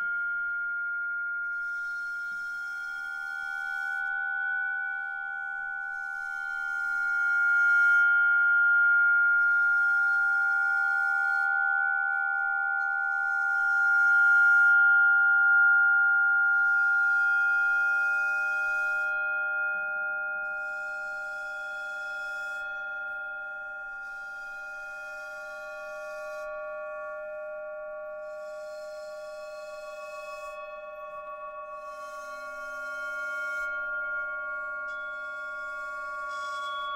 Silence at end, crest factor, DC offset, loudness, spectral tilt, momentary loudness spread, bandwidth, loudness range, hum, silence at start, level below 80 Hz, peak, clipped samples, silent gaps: 0 s; 12 dB; under 0.1%; -26 LUFS; -0.5 dB/octave; 19 LU; 10 kHz; 18 LU; none; 0 s; -68 dBFS; -16 dBFS; under 0.1%; none